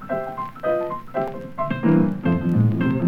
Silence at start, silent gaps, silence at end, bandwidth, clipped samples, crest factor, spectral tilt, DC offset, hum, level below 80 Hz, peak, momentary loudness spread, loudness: 0 s; none; 0 s; 5.2 kHz; under 0.1%; 16 dB; -10 dB/octave; under 0.1%; none; -48 dBFS; -6 dBFS; 9 LU; -22 LUFS